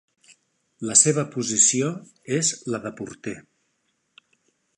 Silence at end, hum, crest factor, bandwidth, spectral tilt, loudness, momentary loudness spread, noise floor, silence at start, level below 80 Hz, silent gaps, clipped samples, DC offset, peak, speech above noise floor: 1.4 s; none; 26 dB; 11.5 kHz; -3 dB/octave; -20 LUFS; 19 LU; -72 dBFS; 0.8 s; -68 dBFS; none; under 0.1%; under 0.1%; 0 dBFS; 49 dB